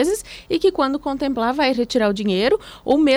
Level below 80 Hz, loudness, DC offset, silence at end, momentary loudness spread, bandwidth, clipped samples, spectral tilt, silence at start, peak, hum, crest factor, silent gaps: -46 dBFS; -20 LUFS; under 0.1%; 0 s; 5 LU; over 20 kHz; under 0.1%; -4.5 dB/octave; 0 s; -6 dBFS; none; 14 dB; none